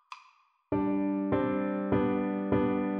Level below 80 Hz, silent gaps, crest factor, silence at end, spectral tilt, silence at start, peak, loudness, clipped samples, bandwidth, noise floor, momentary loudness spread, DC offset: -54 dBFS; none; 16 dB; 0 s; -10 dB/octave; 0.1 s; -14 dBFS; -30 LUFS; under 0.1%; 5.2 kHz; -64 dBFS; 6 LU; under 0.1%